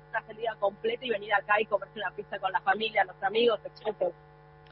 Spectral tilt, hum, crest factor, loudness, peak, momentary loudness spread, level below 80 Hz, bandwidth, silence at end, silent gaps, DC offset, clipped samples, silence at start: -7.5 dB/octave; 50 Hz at -60 dBFS; 18 dB; -30 LUFS; -12 dBFS; 10 LU; -66 dBFS; 5.8 kHz; 0.6 s; none; under 0.1%; under 0.1%; 0.15 s